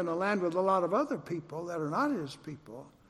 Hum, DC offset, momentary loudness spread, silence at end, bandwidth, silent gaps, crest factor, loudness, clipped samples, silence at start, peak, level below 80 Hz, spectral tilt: none; under 0.1%; 17 LU; 0.2 s; 13 kHz; none; 18 dB; -32 LUFS; under 0.1%; 0 s; -16 dBFS; -72 dBFS; -6.5 dB/octave